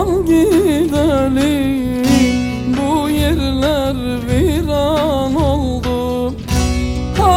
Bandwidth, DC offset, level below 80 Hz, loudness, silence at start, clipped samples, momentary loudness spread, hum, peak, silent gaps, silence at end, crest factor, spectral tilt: 16.5 kHz; under 0.1%; -26 dBFS; -15 LUFS; 0 s; under 0.1%; 6 LU; none; -2 dBFS; none; 0 s; 12 dB; -6 dB/octave